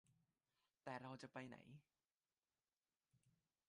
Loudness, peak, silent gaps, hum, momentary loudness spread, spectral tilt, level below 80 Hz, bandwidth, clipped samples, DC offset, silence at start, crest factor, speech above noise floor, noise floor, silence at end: -57 LUFS; -38 dBFS; 2.05-2.09 s, 2.77-2.81 s; none; 12 LU; -6 dB/octave; under -90 dBFS; 10 kHz; under 0.1%; under 0.1%; 0.1 s; 22 dB; over 34 dB; under -90 dBFS; 0.4 s